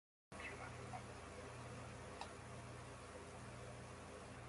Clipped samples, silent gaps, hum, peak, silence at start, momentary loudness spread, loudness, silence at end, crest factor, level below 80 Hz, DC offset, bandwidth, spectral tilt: under 0.1%; none; 60 Hz at -60 dBFS; -34 dBFS; 0.3 s; 3 LU; -54 LUFS; 0 s; 20 dB; -64 dBFS; under 0.1%; 11.5 kHz; -4.5 dB/octave